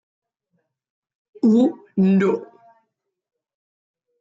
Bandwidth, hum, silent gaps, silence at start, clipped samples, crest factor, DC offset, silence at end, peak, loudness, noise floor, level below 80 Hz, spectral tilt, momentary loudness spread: 7.6 kHz; none; none; 1.45 s; under 0.1%; 16 dB; under 0.1%; 1.75 s; -8 dBFS; -19 LUFS; -75 dBFS; -70 dBFS; -9 dB/octave; 6 LU